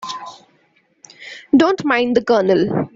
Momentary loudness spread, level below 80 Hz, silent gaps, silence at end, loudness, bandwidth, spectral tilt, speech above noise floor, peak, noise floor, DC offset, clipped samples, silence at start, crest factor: 21 LU; -56 dBFS; none; 0.1 s; -15 LUFS; 7.8 kHz; -6 dB/octave; 44 dB; -2 dBFS; -59 dBFS; under 0.1%; under 0.1%; 0 s; 16 dB